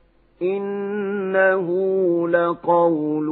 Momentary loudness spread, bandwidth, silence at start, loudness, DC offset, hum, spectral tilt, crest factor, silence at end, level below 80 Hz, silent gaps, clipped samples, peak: 7 LU; 4.1 kHz; 0.4 s; -20 LUFS; under 0.1%; none; -11 dB/octave; 16 dB; 0 s; -68 dBFS; none; under 0.1%; -4 dBFS